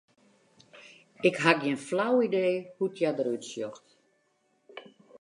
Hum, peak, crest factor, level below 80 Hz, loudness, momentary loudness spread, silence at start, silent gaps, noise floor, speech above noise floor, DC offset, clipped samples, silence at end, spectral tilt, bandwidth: none; -4 dBFS; 26 dB; -84 dBFS; -28 LUFS; 23 LU; 0.75 s; none; -72 dBFS; 44 dB; under 0.1%; under 0.1%; 0.05 s; -5 dB/octave; 11 kHz